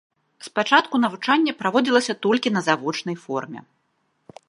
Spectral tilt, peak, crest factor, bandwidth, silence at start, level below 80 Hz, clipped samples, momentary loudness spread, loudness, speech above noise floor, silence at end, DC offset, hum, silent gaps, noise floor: -4 dB/octave; -2 dBFS; 20 dB; 11.5 kHz; 0.4 s; -76 dBFS; under 0.1%; 11 LU; -21 LUFS; 48 dB; 0.9 s; under 0.1%; none; none; -70 dBFS